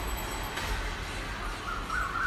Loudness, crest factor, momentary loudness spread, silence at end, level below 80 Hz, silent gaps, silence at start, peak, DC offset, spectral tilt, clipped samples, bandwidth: -34 LUFS; 14 dB; 4 LU; 0 s; -38 dBFS; none; 0 s; -18 dBFS; under 0.1%; -3.5 dB/octave; under 0.1%; 15 kHz